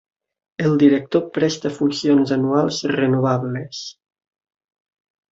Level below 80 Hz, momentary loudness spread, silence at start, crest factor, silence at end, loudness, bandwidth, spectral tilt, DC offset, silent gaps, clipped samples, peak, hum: -62 dBFS; 14 LU; 0.6 s; 18 dB; 1.4 s; -19 LUFS; 7.8 kHz; -6 dB/octave; under 0.1%; none; under 0.1%; -2 dBFS; none